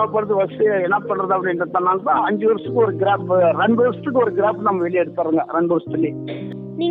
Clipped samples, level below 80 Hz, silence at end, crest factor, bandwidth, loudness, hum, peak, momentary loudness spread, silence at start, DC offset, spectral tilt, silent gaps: under 0.1%; -64 dBFS; 0 s; 14 dB; 4.2 kHz; -19 LUFS; none; -4 dBFS; 6 LU; 0 s; under 0.1%; -10 dB/octave; none